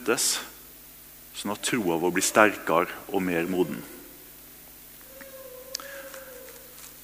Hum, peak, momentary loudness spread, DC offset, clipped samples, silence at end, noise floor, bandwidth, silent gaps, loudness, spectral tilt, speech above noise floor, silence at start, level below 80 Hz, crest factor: none; -2 dBFS; 23 LU; under 0.1%; under 0.1%; 0 s; -48 dBFS; 16 kHz; none; -26 LUFS; -3 dB/octave; 23 dB; 0 s; -62 dBFS; 26 dB